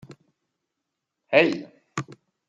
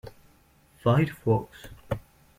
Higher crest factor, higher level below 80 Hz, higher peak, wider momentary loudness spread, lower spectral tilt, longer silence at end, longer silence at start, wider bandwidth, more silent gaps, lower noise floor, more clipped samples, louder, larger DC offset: first, 26 dB vs 18 dB; second, -74 dBFS vs -52 dBFS; first, -2 dBFS vs -10 dBFS; second, 16 LU vs 22 LU; second, -5 dB/octave vs -8 dB/octave; about the same, 0.35 s vs 0.4 s; first, 1.3 s vs 0.05 s; second, 9.2 kHz vs 16 kHz; neither; first, -83 dBFS vs -60 dBFS; neither; first, -22 LUFS vs -27 LUFS; neither